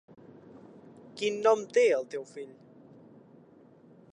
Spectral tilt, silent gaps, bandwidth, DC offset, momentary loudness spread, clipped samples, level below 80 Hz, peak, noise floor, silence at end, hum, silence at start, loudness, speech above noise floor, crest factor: -3.5 dB/octave; none; 10 kHz; under 0.1%; 23 LU; under 0.1%; -84 dBFS; -12 dBFS; -57 dBFS; 1.6 s; none; 1.15 s; -28 LUFS; 29 dB; 20 dB